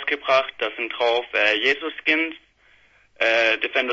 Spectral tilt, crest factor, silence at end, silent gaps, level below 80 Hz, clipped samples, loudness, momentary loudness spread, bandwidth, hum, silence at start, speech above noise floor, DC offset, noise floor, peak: -2.5 dB/octave; 18 dB; 0 s; none; -66 dBFS; under 0.1%; -21 LUFS; 8 LU; 7.8 kHz; none; 0 s; 35 dB; under 0.1%; -57 dBFS; -4 dBFS